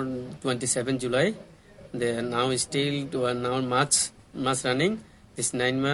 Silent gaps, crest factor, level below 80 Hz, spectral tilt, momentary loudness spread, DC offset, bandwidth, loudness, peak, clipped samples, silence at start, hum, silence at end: none; 20 dB; -58 dBFS; -3.5 dB/octave; 9 LU; under 0.1%; 12 kHz; -26 LUFS; -8 dBFS; under 0.1%; 0 s; none; 0 s